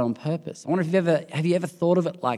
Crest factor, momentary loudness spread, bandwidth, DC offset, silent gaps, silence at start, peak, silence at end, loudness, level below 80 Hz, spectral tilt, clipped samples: 16 dB; 7 LU; 12 kHz; under 0.1%; none; 0 s; -8 dBFS; 0 s; -24 LUFS; -76 dBFS; -7.5 dB/octave; under 0.1%